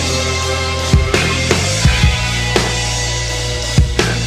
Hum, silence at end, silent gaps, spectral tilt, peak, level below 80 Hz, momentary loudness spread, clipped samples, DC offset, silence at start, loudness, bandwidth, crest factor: none; 0 s; none; -3.5 dB/octave; 0 dBFS; -20 dBFS; 4 LU; under 0.1%; under 0.1%; 0 s; -15 LUFS; 15.5 kHz; 14 dB